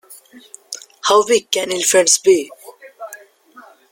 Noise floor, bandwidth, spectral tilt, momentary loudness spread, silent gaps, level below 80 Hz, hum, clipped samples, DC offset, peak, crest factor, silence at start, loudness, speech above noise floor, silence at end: -45 dBFS; 17 kHz; -1 dB/octave; 23 LU; none; -66 dBFS; none; under 0.1%; under 0.1%; 0 dBFS; 18 dB; 0.1 s; -14 LUFS; 30 dB; 0.3 s